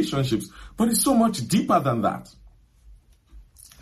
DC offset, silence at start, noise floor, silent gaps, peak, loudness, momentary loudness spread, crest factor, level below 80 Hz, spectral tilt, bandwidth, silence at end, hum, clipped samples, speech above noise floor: under 0.1%; 0 s; -52 dBFS; none; -8 dBFS; -22 LUFS; 10 LU; 16 dB; -50 dBFS; -5 dB/octave; 15 kHz; 0.4 s; none; under 0.1%; 29 dB